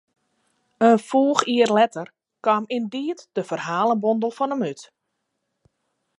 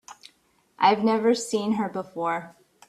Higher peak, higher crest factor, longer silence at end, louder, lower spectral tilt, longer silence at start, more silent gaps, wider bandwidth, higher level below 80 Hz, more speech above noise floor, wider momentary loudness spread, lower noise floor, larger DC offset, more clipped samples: first, 0 dBFS vs -6 dBFS; about the same, 22 dB vs 20 dB; first, 1.35 s vs 0.4 s; first, -21 LUFS vs -24 LUFS; about the same, -5 dB/octave vs -4.5 dB/octave; first, 0.8 s vs 0.1 s; neither; second, 11.5 kHz vs 13.5 kHz; second, -76 dBFS vs -70 dBFS; first, 56 dB vs 40 dB; about the same, 11 LU vs 9 LU; first, -77 dBFS vs -65 dBFS; neither; neither